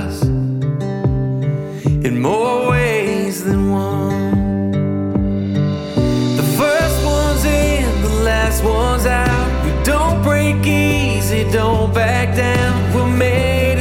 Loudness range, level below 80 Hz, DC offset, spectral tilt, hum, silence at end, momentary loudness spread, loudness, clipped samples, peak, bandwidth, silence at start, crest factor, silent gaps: 2 LU; -24 dBFS; under 0.1%; -6 dB/octave; none; 0 s; 4 LU; -16 LUFS; under 0.1%; -4 dBFS; 17.5 kHz; 0 s; 12 dB; none